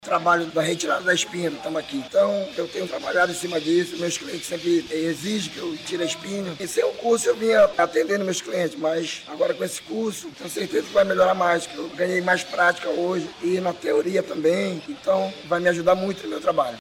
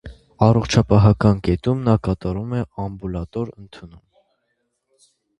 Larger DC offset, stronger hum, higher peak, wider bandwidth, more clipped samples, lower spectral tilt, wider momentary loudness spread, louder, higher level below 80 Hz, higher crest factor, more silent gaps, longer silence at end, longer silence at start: neither; neither; second, -8 dBFS vs 0 dBFS; first, 17.5 kHz vs 8.6 kHz; neither; second, -4 dB/octave vs -7.5 dB/octave; second, 9 LU vs 14 LU; second, -23 LUFS vs -19 LUFS; second, -62 dBFS vs -36 dBFS; about the same, 16 dB vs 20 dB; neither; second, 0 s vs 1.5 s; about the same, 0.05 s vs 0.05 s